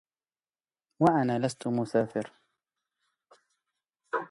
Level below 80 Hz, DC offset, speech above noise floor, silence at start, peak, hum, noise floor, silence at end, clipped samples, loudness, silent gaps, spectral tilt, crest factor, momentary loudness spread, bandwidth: -70 dBFS; under 0.1%; over 63 dB; 1 s; -10 dBFS; none; under -90 dBFS; 0.05 s; under 0.1%; -29 LUFS; none; -7 dB/octave; 22 dB; 11 LU; 11.5 kHz